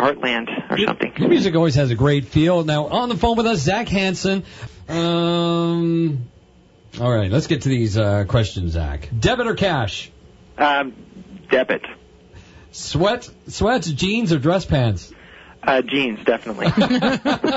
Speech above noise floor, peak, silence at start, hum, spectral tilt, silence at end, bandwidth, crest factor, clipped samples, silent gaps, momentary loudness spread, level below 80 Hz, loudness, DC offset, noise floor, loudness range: 31 dB; -4 dBFS; 0 s; none; -6 dB/octave; 0 s; 8 kHz; 16 dB; under 0.1%; none; 9 LU; -38 dBFS; -19 LUFS; under 0.1%; -50 dBFS; 4 LU